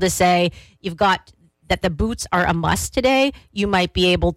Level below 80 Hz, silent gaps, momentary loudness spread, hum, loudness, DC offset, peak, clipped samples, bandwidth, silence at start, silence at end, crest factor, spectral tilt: -36 dBFS; none; 8 LU; none; -19 LUFS; under 0.1%; -8 dBFS; under 0.1%; 16.5 kHz; 0 s; 0 s; 12 dB; -4.5 dB/octave